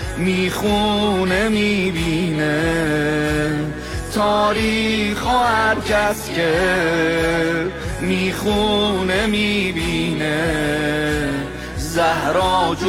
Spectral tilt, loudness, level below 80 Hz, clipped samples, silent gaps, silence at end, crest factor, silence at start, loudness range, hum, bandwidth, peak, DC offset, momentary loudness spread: -5 dB/octave; -18 LUFS; -34 dBFS; under 0.1%; none; 0 s; 12 dB; 0 s; 2 LU; none; 16.5 kHz; -6 dBFS; under 0.1%; 5 LU